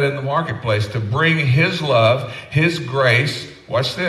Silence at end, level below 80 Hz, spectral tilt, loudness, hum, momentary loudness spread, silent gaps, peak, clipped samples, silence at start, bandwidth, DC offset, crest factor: 0 s; -52 dBFS; -6 dB/octave; -17 LUFS; none; 7 LU; none; -2 dBFS; under 0.1%; 0 s; 13 kHz; under 0.1%; 14 dB